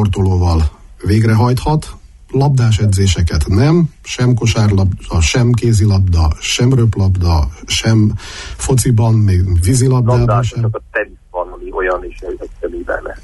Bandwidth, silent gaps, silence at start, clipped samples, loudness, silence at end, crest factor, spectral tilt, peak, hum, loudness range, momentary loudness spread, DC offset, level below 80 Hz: 12 kHz; none; 0 s; under 0.1%; -14 LUFS; 0.05 s; 10 dB; -6 dB/octave; -2 dBFS; none; 2 LU; 12 LU; under 0.1%; -24 dBFS